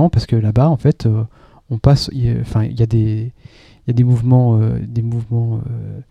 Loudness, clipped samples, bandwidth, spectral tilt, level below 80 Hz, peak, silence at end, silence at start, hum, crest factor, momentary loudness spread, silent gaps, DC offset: -16 LUFS; under 0.1%; 9.4 kHz; -8.5 dB/octave; -34 dBFS; 0 dBFS; 0.1 s; 0 s; none; 14 dB; 13 LU; none; under 0.1%